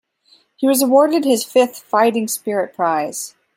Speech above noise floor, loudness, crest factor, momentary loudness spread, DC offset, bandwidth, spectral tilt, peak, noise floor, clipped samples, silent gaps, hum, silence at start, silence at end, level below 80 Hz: 39 dB; -17 LUFS; 16 dB; 8 LU; under 0.1%; 16.5 kHz; -3.5 dB/octave; -2 dBFS; -56 dBFS; under 0.1%; none; none; 0.6 s; 0.25 s; -72 dBFS